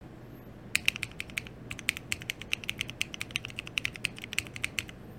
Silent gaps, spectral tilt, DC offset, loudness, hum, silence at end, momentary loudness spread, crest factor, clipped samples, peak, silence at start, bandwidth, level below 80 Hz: none; -1.5 dB/octave; under 0.1%; -34 LUFS; none; 0 s; 10 LU; 34 dB; under 0.1%; -4 dBFS; 0 s; 17 kHz; -56 dBFS